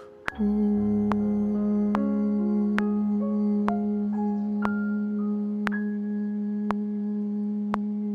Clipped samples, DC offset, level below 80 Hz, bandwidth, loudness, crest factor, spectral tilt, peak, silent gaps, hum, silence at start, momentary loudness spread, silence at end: under 0.1%; under 0.1%; -54 dBFS; 4.8 kHz; -27 LUFS; 20 dB; -9.5 dB/octave; -6 dBFS; none; none; 0 s; 5 LU; 0 s